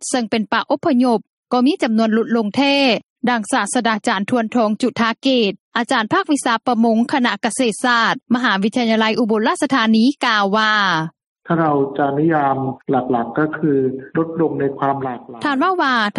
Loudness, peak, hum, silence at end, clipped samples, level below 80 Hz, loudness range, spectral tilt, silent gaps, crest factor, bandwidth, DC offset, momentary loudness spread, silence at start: -17 LUFS; -2 dBFS; none; 0 s; under 0.1%; -64 dBFS; 3 LU; -4.5 dB/octave; 1.29-1.43 s, 3.10-3.16 s, 5.60-5.72 s, 11.27-11.35 s; 16 dB; 11.5 kHz; under 0.1%; 6 LU; 0 s